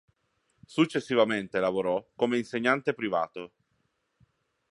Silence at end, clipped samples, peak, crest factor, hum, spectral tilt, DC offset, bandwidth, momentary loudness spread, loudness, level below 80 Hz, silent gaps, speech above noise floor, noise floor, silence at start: 1.25 s; under 0.1%; -10 dBFS; 20 dB; none; -5.5 dB/octave; under 0.1%; 11.5 kHz; 10 LU; -28 LUFS; -72 dBFS; none; 48 dB; -75 dBFS; 0.7 s